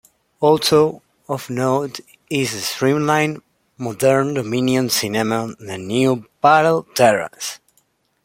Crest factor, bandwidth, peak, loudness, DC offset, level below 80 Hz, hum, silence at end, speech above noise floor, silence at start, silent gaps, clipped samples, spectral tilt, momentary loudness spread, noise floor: 18 dB; 16.5 kHz; -2 dBFS; -18 LUFS; under 0.1%; -58 dBFS; none; 0.7 s; 45 dB; 0.4 s; none; under 0.1%; -4.5 dB/octave; 15 LU; -63 dBFS